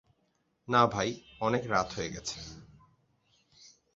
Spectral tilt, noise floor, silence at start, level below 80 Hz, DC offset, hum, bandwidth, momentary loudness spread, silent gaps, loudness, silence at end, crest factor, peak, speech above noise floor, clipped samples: -3.5 dB/octave; -75 dBFS; 0.7 s; -60 dBFS; under 0.1%; none; 7.6 kHz; 13 LU; none; -30 LUFS; 0.3 s; 24 dB; -10 dBFS; 45 dB; under 0.1%